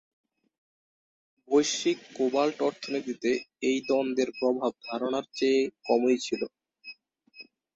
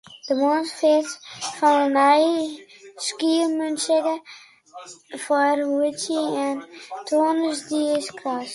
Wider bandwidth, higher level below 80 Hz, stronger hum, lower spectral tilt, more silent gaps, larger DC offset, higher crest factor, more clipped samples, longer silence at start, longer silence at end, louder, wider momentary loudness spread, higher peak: second, 8.2 kHz vs 11.5 kHz; about the same, -74 dBFS vs -76 dBFS; neither; about the same, -3.5 dB/octave vs -2.5 dB/octave; neither; neither; about the same, 18 dB vs 16 dB; neither; first, 1.5 s vs 0.1 s; first, 0.3 s vs 0 s; second, -28 LUFS vs -22 LUFS; second, 9 LU vs 16 LU; second, -10 dBFS vs -6 dBFS